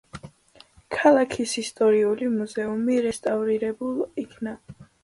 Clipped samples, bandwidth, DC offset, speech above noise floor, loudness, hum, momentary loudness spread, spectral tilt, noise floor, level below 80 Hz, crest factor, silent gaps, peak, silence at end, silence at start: under 0.1%; 11.5 kHz; under 0.1%; 31 dB; -24 LUFS; none; 15 LU; -4.5 dB/octave; -54 dBFS; -60 dBFS; 20 dB; none; -6 dBFS; 0.2 s; 0.15 s